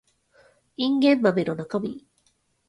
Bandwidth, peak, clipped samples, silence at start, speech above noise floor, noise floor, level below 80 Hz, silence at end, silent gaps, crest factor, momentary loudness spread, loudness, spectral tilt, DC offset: 10.5 kHz; -6 dBFS; under 0.1%; 0.8 s; 45 dB; -68 dBFS; -68 dBFS; 0.7 s; none; 18 dB; 20 LU; -23 LUFS; -7 dB/octave; under 0.1%